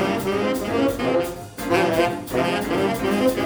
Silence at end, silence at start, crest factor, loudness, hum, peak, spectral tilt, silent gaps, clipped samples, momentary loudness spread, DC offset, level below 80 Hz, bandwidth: 0 s; 0 s; 16 dB; -22 LUFS; none; -6 dBFS; -5 dB/octave; none; under 0.1%; 4 LU; under 0.1%; -46 dBFS; over 20 kHz